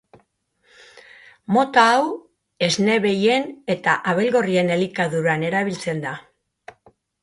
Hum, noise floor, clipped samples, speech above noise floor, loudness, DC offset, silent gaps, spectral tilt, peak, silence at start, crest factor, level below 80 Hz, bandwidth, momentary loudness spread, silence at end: none; -65 dBFS; under 0.1%; 45 dB; -20 LUFS; under 0.1%; none; -5 dB/octave; -2 dBFS; 1.5 s; 20 dB; -64 dBFS; 11.5 kHz; 11 LU; 1 s